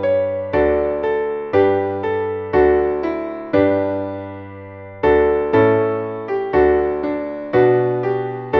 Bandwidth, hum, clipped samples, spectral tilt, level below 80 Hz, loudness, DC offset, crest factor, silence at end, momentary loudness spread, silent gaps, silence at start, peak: 5.4 kHz; none; under 0.1%; -9.5 dB/octave; -40 dBFS; -18 LUFS; under 0.1%; 14 dB; 0 s; 10 LU; none; 0 s; -2 dBFS